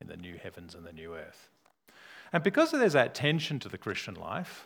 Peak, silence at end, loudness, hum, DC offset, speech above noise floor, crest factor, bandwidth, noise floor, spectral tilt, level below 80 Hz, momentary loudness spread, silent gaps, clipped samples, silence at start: -8 dBFS; 0 s; -29 LUFS; none; under 0.1%; 28 dB; 24 dB; 19.5 kHz; -59 dBFS; -5.5 dB/octave; -68 dBFS; 22 LU; none; under 0.1%; 0 s